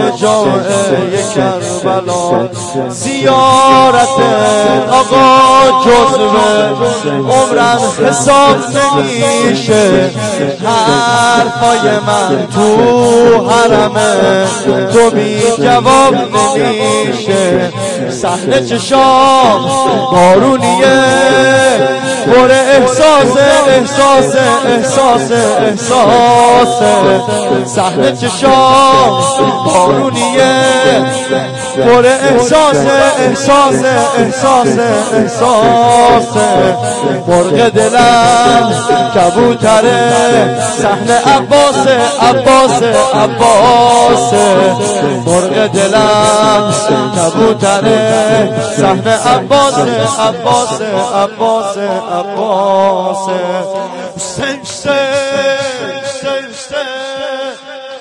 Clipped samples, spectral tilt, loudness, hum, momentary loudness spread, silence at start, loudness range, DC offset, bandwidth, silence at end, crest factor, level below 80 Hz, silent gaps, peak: 0.4%; -4 dB/octave; -8 LUFS; none; 8 LU; 0 s; 5 LU; 0.2%; 11.5 kHz; 0 s; 8 dB; -42 dBFS; none; 0 dBFS